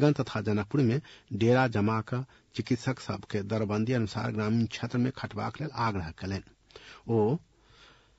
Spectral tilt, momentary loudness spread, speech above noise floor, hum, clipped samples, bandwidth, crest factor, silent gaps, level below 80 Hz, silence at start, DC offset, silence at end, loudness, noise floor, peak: -7.5 dB/octave; 11 LU; 29 dB; none; under 0.1%; 8 kHz; 20 dB; none; -60 dBFS; 0 s; under 0.1%; 0.8 s; -30 LUFS; -58 dBFS; -10 dBFS